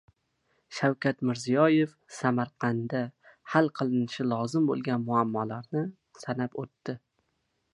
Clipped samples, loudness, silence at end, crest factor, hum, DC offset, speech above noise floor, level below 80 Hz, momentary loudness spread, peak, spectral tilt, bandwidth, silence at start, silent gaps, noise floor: under 0.1%; -29 LUFS; 0.75 s; 22 dB; none; under 0.1%; 49 dB; -72 dBFS; 13 LU; -8 dBFS; -6.5 dB/octave; 11.5 kHz; 0.7 s; none; -77 dBFS